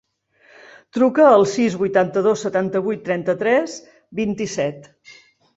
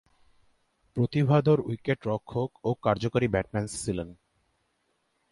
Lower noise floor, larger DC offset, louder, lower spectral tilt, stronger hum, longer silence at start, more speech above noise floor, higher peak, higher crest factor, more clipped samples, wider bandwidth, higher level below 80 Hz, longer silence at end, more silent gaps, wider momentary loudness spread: second, -56 dBFS vs -74 dBFS; neither; first, -19 LUFS vs -28 LUFS; second, -5.5 dB/octave vs -7 dB/octave; neither; about the same, 0.95 s vs 0.95 s; second, 38 dB vs 47 dB; first, -2 dBFS vs -10 dBFS; about the same, 18 dB vs 18 dB; neither; second, 8 kHz vs 11.5 kHz; second, -60 dBFS vs -54 dBFS; second, 0.45 s vs 1.2 s; neither; first, 13 LU vs 10 LU